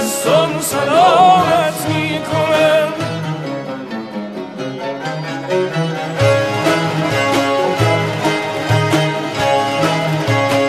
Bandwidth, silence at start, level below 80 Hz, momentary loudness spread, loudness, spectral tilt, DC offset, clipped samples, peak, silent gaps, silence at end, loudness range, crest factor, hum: 14 kHz; 0 s; -50 dBFS; 12 LU; -15 LUFS; -5 dB/octave; under 0.1%; under 0.1%; 0 dBFS; none; 0 s; 6 LU; 16 dB; none